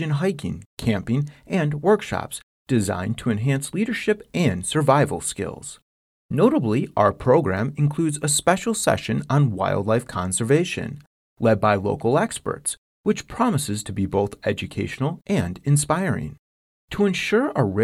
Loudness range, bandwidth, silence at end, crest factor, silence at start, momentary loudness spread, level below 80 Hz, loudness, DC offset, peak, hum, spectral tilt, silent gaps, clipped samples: 4 LU; 14.5 kHz; 0 s; 20 dB; 0 s; 9 LU; -50 dBFS; -22 LUFS; under 0.1%; -4 dBFS; none; -5.5 dB/octave; 0.66-0.77 s, 2.43-2.66 s, 5.82-6.29 s, 11.07-11.36 s, 12.78-13.04 s, 16.39-16.88 s; under 0.1%